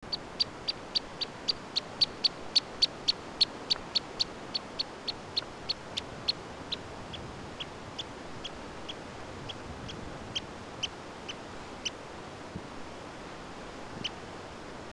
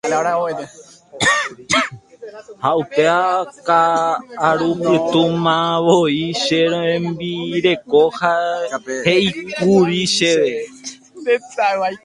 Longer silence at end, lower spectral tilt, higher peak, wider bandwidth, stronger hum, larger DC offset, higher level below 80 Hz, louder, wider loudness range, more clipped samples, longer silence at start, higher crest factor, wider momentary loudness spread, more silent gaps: about the same, 0 s vs 0.1 s; second, -2.5 dB/octave vs -4.5 dB/octave; second, -14 dBFS vs 0 dBFS; about the same, 12 kHz vs 11.5 kHz; neither; neither; about the same, -56 dBFS vs -56 dBFS; second, -34 LUFS vs -17 LUFS; first, 12 LU vs 2 LU; neither; about the same, 0 s vs 0.05 s; first, 22 dB vs 16 dB; first, 15 LU vs 10 LU; neither